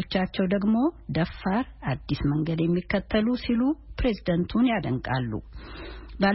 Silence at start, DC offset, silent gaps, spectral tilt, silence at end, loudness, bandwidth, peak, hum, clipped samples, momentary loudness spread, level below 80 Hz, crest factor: 0 s; under 0.1%; none; -11 dB/octave; 0 s; -26 LUFS; 5.8 kHz; -10 dBFS; none; under 0.1%; 10 LU; -42 dBFS; 16 dB